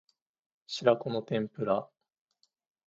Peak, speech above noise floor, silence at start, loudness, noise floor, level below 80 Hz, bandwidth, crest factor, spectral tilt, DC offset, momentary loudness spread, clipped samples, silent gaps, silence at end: -10 dBFS; 46 dB; 0.7 s; -31 LUFS; -76 dBFS; -76 dBFS; 7.8 kHz; 24 dB; -6 dB/octave; under 0.1%; 6 LU; under 0.1%; none; 1 s